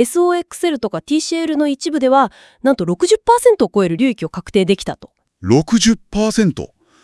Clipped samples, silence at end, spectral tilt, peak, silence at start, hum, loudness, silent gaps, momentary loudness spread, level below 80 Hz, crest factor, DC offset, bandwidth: under 0.1%; 0.35 s; -5 dB/octave; 0 dBFS; 0 s; none; -16 LUFS; none; 9 LU; -44 dBFS; 16 dB; under 0.1%; 12 kHz